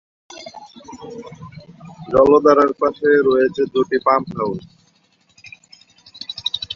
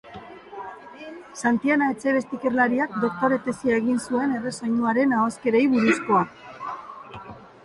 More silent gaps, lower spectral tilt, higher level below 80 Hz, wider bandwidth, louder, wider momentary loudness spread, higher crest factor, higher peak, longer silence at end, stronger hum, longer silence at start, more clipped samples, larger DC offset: neither; about the same, -5.5 dB/octave vs -5.5 dB/octave; first, -52 dBFS vs -62 dBFS; second, 7.4 kHz vs 11.5 kHz; first, -16 LUFS vs -23 LUFS; first, 25 LU vs 20 LU; about the same, 18 dB vs 16 dB; first, 0 dBFS vs -8 dBFS; second, 0 s vs 0.2 s; neither; first, 0.35 s vs 0.05 s; neither; neither